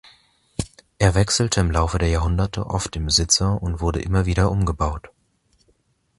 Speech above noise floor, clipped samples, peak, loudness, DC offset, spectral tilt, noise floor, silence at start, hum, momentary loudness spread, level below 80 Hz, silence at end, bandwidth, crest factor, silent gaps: 44 dB; under 0.1%; -2 dBFS; -21 LUFS; under 0.1%; -4.5 dB/octave; -64 dBFS; 0.6 s; none; 14 LU; -30 dBFS; 1.1 s; 11.5 kHz; 20 dB; none